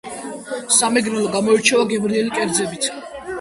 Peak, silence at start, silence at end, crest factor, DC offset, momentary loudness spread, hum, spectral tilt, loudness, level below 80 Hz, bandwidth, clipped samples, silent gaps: 0 dBFS; 0.05 s; 0 s; 18 dB; under 0.1%; 16 LU; none; -2.5 dB/octave; -17 LUFS; -56 dBFS; 11.5 kHz; under 0.1%; none